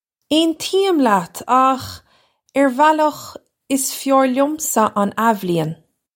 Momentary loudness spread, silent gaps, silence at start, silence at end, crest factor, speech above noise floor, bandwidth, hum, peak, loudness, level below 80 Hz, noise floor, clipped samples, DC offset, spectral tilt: 10 LU; none; 0.3 s; 0.4 s; 16 dB; 40 dB; 17 kHz; none; -2 dBFS; -17 LUFS; -62 dBFS; -57 dBFS; under 0.1%; under 0.1%; -4 dB/octave